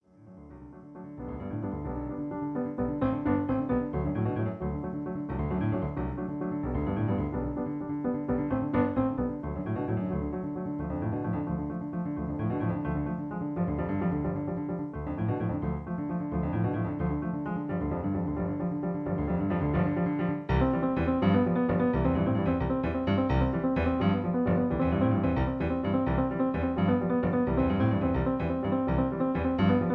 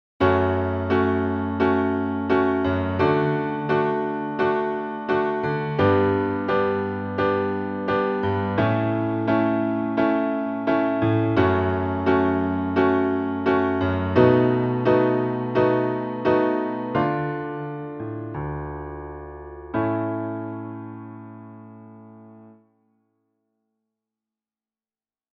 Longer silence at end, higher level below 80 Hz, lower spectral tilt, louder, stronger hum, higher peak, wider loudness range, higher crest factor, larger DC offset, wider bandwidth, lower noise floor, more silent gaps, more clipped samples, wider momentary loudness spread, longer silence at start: second, 0 s vs 2.85 s; first, -42 dBFS vs -50 dBFS; first, -11 dB/octave vs -9.5 dB/octave; second, -30 LUFS vs -22 LUFS; neither; second, -14 dBFS vs -2 dBFS; second, 5 LU vs 10 LU; about the same, 16 dB vs 20 dB; neither; about the same, 5.4 kHz vs 5.8 kHz; second, -51 dBFS vs under -90 dBFS; neither; neither; second, 8 LU vs 12 LU; about the same, 0.2 s vs 0.2 s